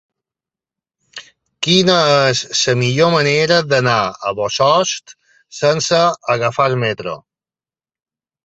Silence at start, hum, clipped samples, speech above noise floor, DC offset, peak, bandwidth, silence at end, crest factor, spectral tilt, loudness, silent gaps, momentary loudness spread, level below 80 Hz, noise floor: 1.15 s; none; under 0.1%; over 75 dB; under 0.1%; 0 dBFS; 8.2 kHz; 1.3 s; 16 dB; -4 dB/octave; -15 LUFS; none; 16 LU; -56 dBFS; under -90 dBFS